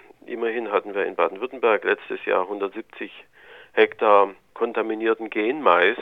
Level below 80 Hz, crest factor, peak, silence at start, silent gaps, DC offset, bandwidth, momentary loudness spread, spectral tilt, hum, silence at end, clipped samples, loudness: -72 dBFS; 20 dB; -2 dBFS; 0.3 s; none; under 0.1%; 4.7 kHz; 13 LU; -6 dB/octave; none; 0 s; under 0.1%; -22 LUFS